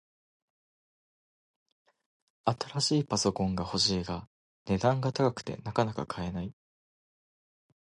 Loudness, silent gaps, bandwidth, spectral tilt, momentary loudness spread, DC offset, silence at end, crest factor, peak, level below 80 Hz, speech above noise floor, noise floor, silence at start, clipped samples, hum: -30 LUFS; 4.27-4.65 s; 11.5 kHz; -5 dB/octave; 11 LU; under 0.1%; 1.35 s; 22 dB; -10 dBFS; -56 dBFS; over 60 dB; under -90 dBFS; 2.45 s; under 0.1%; none